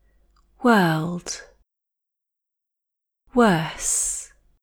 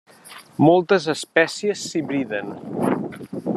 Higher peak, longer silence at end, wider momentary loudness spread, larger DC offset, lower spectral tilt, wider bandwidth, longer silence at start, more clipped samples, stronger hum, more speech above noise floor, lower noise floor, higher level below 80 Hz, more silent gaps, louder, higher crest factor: about the same, -4 dBFS vs -2 dBFS; first, 0.4 s vs 0 s; about the same, 13 LU vs 14 LU; neither; second, -4 dB/octave vs -5.5 dB/octave; first, 20 kHz vs 13 kHz; first, 0.6 s vs 0.25 s; neither; neither; first, 64 dB vs 24 dB; first, -84 dBFS vs -44 dBFS; first, -52 dBFS vs -66 dBFS; neither; about the same, -21 LUFS vs -21 LUFS; about the same, 20 dB vs 20 dB